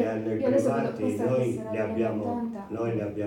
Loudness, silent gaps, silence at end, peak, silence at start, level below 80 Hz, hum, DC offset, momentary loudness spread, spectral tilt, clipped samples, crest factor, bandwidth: -28 LUFS; none; 0 s; -12 dBFS; 0 s; -64 dBFS; none; under 0.1%; 7 LU; -8 dB/octave; under 0.1%; 16 dB; 16.5 kHz